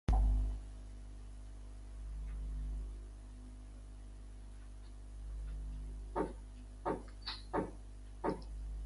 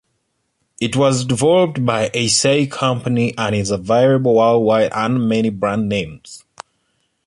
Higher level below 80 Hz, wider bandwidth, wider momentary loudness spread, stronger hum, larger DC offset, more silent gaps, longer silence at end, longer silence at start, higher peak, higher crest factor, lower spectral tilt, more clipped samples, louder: first, -42 dBFS vs -50 dBFS; about the same, 11 kHz vs 11.5 kHz; first, 14 LU vs 8 LU; first, 50 Hz at -45 dBFS vs none; neither; neither; second, 0 s vs 0.9 s; second, 0.1 s vs 0.8 s; second, -20 dBFS vs -2 dBFS; first, 20 dB vs 14 dB; first, -7 dB/octave vs -5 dB/octave; neither; second, -45 LUFS vs -16 LUFS